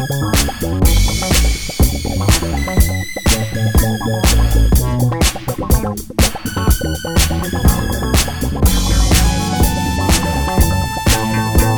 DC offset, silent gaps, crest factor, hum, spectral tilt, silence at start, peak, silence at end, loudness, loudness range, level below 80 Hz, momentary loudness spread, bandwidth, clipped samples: under 0.1%; none; 14 dB; none; -4.5 dB/octave; 0 s; 0 dBFS; 0 s; -15 LUFS; 1 LU; -18 dBFS; 4 LU; over 20 kHz; under 0.1%